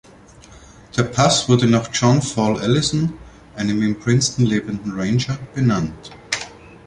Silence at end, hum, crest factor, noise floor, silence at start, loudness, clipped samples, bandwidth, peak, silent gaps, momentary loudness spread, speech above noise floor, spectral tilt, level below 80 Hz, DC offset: 0.2 s; none; 18 dB; -45 dBFS; 0.5 s; -19 LUFS; under 0.1%; 11 kHz; 0 dBFS; none; 10 LU; 27 dB; -5 dB/octave; -46 dBFS; under 0.1%